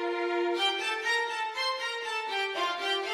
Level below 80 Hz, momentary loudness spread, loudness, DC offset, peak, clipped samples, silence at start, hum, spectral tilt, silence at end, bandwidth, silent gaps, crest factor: -78 dBFS; 4 LU; -29 LUFS; under 0.1%; -16 dBFS; under 0.1%; 0 s; none; 0 dB/octave; 0 s; 15 kHz; none; 14 dB